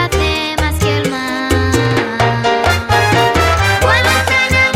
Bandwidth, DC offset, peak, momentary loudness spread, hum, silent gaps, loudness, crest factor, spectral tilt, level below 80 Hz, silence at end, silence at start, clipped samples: 16.5 kHz; under 0.1%; 0 dBFS; 5 LU; none; none; -13 LUFS; 12 dB; -4.5 dB/octave; -26 dBFS; 0 s; 0 s; under 0.1%